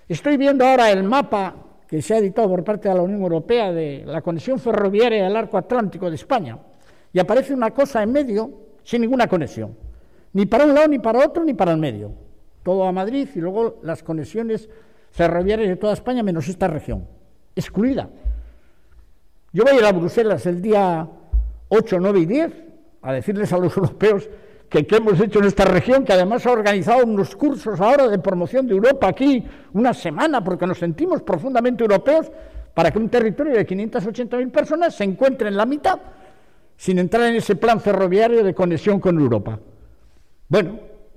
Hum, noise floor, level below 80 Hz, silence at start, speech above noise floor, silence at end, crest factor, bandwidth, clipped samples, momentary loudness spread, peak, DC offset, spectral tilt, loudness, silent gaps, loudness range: none; -54 dBFS; -40 dBFS; 0.1 s; 36 dB; 0.3 s; 12 dB; 15 kHz; under 0.1%; 12 LU; -6 dBFS; 0.4%; -7 dB/octave; -19 LUFS; none; 5 LU